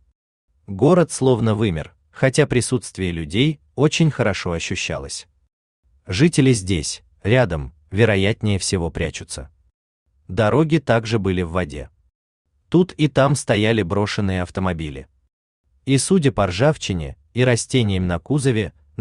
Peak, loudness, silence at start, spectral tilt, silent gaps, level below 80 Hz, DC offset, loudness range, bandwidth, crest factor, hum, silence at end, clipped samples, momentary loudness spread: -2 dBFS; -20 LUFS; 0.7 s; -5.5 dB/octave; 5.53-5.83 s, 9.74-10.06 s, 12.15-12.45 s, 15.33-15.64 s; -44 dBFS; under 0.1%; 3 LU; 12.5 kHz; 18 dB; none; 0.3 s; under 0.1%; 12 LU